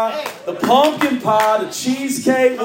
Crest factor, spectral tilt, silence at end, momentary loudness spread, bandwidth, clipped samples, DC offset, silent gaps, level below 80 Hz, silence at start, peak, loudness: 16 dB; -3.5 dB/octave; 0 s; 8 LU; 17 kHz; under 0.1%; under 0.1%; none; -64 dBFS; 0 s; -2 dBFS; -17 LUFS